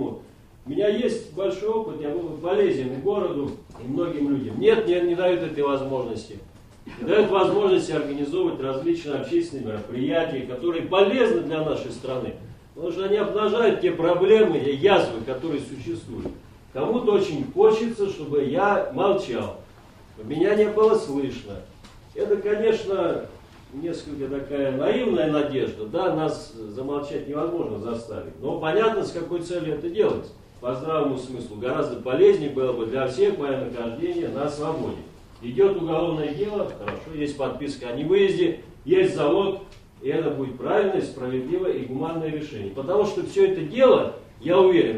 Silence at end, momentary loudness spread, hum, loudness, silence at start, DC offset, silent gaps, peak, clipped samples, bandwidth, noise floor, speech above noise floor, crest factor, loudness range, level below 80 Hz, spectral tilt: 0 s; 14 LU; none; -24 LUFS; 0 s; under 0.1%; none; -4 dBFS; under 0.1%; 10.5 kHz; -48 dBFS; 25 dB; 20 dB; 4 LU; -52 dBFS; -6.5 dB/octave